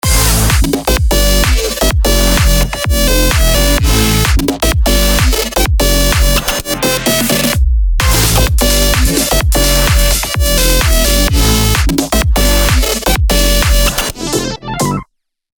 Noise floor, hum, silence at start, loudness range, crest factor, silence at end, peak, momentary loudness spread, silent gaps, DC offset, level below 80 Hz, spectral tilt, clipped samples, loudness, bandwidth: -39 dBFS; none; 0.05 s; 1 LU; 10 dB; 0.55 s; 0 dBFS; 3 LU; none; under 0.1%; -14 dBFS; -3.5 dB/octave; under 0.1%; -11 LUFS; 19.5 kHz